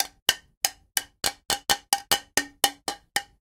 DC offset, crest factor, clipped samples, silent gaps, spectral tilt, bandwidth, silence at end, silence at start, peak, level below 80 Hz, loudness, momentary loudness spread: under 0.1%; 28 dB; under 0.1%; 0.22-0.26 s, 0.57-0.61 s; 0.5 dB/octave; 19 kHz; 0.15 s; 0 s; 0 dBFS; -56 dBFS; -26 LUFS; 6 LU